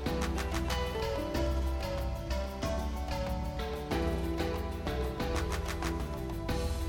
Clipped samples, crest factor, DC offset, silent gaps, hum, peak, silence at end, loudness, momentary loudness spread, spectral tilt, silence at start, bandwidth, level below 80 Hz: under 0.1%; 16 dB; under 0.1%; none; none; -18 dBFS; 0 s; -35 LUFS; 3 LU; -5.5 dB/octave; 0 s; 17.5 kHz; -36 dBFS